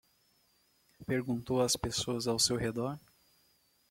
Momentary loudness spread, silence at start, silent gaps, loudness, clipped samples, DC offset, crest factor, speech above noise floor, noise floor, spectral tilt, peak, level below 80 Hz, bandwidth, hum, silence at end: 10 LU; 1 s; none; -32 LUFS; under 0.1%; under 0.1%; 20 dB; 38 dB; -71 dBFS; -3.5 dB/octave; -14 dBFS; -60 dBFS; 16.5 kHz; none; 0.95 s